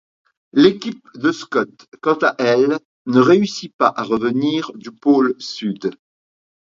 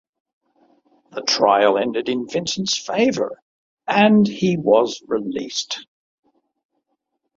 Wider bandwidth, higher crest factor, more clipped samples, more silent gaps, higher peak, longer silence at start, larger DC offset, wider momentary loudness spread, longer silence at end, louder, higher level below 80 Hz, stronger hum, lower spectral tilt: about the same, 7.6 kHz vs 7.6 kHz; about the same, 18 dB vs 20 dB; neither; about the same, 1.88-1.92 s, 2.85-3.05 s, 3.73-3.79 s vs 3.42-3.77 s; about the same, 0 dBFS vs -2 dBFS; second, 0.55 s vs 1.15 s; neither; about the same, 11 LU vs 12 LU; second, 0.85 s vs 1.55 s; about the same, -18 LUFS vs -19 LUFS; about the same, -64 dBFS vs -64 dBFS; neither; first, -6 dB/octave vs -4.5 dB/octave